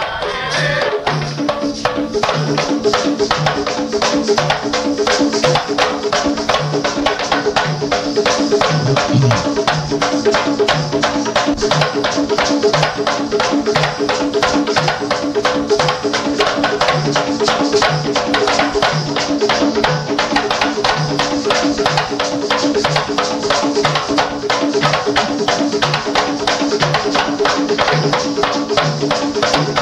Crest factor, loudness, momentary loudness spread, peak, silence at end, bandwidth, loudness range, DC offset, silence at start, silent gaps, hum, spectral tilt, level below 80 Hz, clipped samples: 14 dB; -15 LUFS; 3 LU; -2 dBFS; 0 s; 12 kHz; 1 LU; under 0.1%; 0 s; none; none; -4 dB/octave; -42 dBFS; under 0.1%